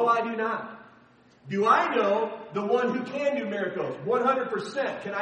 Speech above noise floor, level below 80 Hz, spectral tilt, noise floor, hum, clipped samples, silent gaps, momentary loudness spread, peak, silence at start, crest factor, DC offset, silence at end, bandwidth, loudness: 31 dB; -76 dBFS; -6 dB/octave; -57 dBFS; none; under 0.1%; none; 10 LU; -8 dBFS; 0 s; 20 dB; under 0.1%; 0 s; 9.4 kHz; -27 LUFS